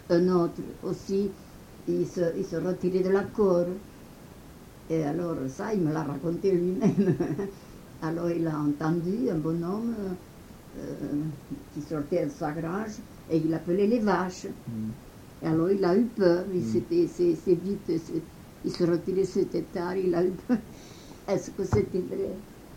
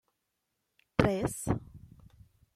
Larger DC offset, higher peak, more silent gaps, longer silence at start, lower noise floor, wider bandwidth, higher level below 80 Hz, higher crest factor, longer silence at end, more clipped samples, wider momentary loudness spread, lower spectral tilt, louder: neither; about the same, -8 dBFS vs -8 dBFS; neither; second, 0 s vs 1 s; second, -48 dBFS vs -83 dBFS; about the same, 17 kHz vs 15.5 kHz; about the same, -54 dBFS vs -52 dBFS; second, 20 dB vs 28 dB; second, 0 s vs 0.7 s; neither; first, 17 LU vs 7 LU; first, -7.5 dB/octave vs -6 dB/octave; first, -28 LUFS vs -32 LUFS